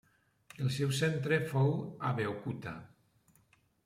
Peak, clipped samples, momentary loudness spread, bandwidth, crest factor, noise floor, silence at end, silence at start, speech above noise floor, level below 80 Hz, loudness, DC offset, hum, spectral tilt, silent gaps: -18 dBFS; under 0.1%; 11 LU; 15 kHz; 18 dB; -69 dBFS; 1 s; 0.6 s; 36 dB; -70 dBFS; -34 LUFS; under 0.1%; none; -6 dB/octave; none